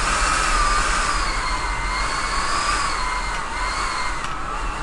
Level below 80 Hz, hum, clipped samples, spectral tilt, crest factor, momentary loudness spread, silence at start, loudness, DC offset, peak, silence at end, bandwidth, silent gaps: -28 dBFS; none; under 0.1%; -2 dB/octave; 14 dB; 7 LU; 0 s; -22 LUFS; under 0.1%; -6 dBFS; 0 s; 11.5 kHz; none